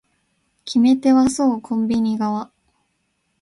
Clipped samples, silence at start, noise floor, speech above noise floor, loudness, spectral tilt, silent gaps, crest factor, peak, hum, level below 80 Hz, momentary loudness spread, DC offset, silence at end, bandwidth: under 0.1%; 0.65 s; -70 dBFS; 52 dB; -18 LUFS; -5.5 dB/octave; none; 16 dB; -4 dBFS; none; -56 dBFS; 13 LU; under 0.1%; 0.95 s; 11.5 kHz